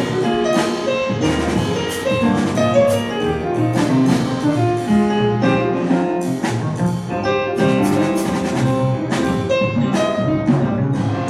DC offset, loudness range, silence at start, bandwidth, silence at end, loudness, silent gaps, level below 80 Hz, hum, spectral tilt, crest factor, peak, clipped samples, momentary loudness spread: under 0.1%; 2 LU; 0 s; 14.5 kHz; 0 s; -18 LUFS; none; -44 dBFS; none; -6.5 dB/octave; 14 dB; -4 dBFS; under 0.1%; 5 LU